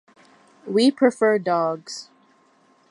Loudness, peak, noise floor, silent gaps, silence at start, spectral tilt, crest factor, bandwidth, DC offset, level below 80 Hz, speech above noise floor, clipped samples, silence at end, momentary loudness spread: -20 LUFS; -6 dBFS; -59 dBFS; none; 0.65 s; -5 dB/octave; 18 dB; 11.5 kHz; under 0.1%; -80 dBFS; 39 dB; under 0.1%; 0.85 s; 18 LU